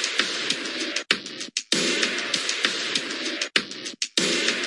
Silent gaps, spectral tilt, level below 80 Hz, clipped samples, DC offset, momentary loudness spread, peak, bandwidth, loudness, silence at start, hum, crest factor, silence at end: none; -0.5 dB/octave; -80 dBFS; under 0.1%; under 0.1%; 6 LU; -2 dBFS; 11.5 kHz; -24 LUFS; 0 s; none; 24 dB; 0 s